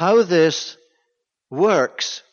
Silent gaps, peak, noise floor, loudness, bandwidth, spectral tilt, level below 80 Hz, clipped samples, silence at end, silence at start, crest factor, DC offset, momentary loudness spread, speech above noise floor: none; -6 dBFS; -74 dBFS; -18 LUFS; 7.2 kHz; -4 dB/octave; -70 dBFS; under 0.1%; 0.15 s; 0 s; 14 dB; under 0.1%; 15 LU; 56 dB